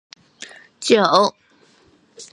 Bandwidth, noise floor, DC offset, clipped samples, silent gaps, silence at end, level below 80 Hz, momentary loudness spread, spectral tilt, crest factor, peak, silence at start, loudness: 11.5 kHz; -55 dBFS; under 0.1%; under 0.1%; none; 0.1 s; -70 dBFS; 24 LU; -3.5 dB/octave; 22 dB; 0 dBFS; 0.4 s; -17 LUFS